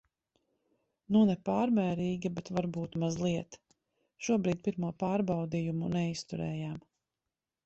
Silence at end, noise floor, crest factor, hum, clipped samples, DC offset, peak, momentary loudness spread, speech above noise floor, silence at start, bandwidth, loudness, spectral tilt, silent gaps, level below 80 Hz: 0.85 s; under -90 dBFS; 16 dB; none; under 0.1%; under 0.1%; -16 dBFS; 9 LU; over 59 dB; 1.1 s; 8.2 kHz; -32 LUFS; -7 dB/octave; none; -64 dBFS